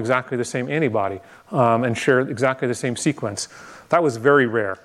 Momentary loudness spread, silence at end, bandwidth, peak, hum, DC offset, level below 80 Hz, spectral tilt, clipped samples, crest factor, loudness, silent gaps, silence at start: 11 LU; 0.1 s; 13 kHz; -2 dBFS; none; under 0.1%; -64 dBFS; -5.5 dB/octave; under 0.1%; 18 dB; -21 LUFS; none; 0 s